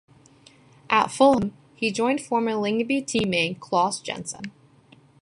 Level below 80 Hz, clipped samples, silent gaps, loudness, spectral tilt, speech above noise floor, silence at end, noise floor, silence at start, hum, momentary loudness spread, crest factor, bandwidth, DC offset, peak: -58 dBFS; under 0.1%; none; -23 LUFS; -4 dB/octave; 32 dB; 0.75 s; -55 dBFS; 0.9 s; none; 13 LU; 20 dB; 11.5 kHz; under 0.1%; -6 dBFS